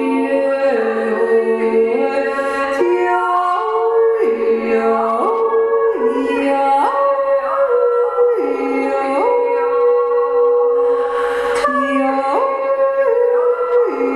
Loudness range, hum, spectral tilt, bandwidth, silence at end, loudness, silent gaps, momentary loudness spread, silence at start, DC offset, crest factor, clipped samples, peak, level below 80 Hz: 1 LU; none; -5 dB/octave; 11 kHz; 0 s; -15 LUFS; none; 3 LU; 0 s; under 0.1%; 12 dB; under 0.1%; -4 dBFS; -56 dBFS